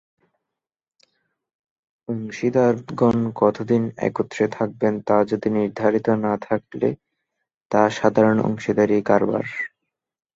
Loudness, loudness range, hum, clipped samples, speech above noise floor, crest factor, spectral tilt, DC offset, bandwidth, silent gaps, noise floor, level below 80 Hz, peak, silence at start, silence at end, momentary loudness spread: -21 LUFS; 2 LU; none; under 0.1%; 67 dB; 20 dB; -7.5 dB/octave; under 0.1%; 7.6 kHz; 7.57-7.70 s; -87 dBFS; -58 dBFS; -2 dBFS; 2.1 s; 0.7 s; 9 LU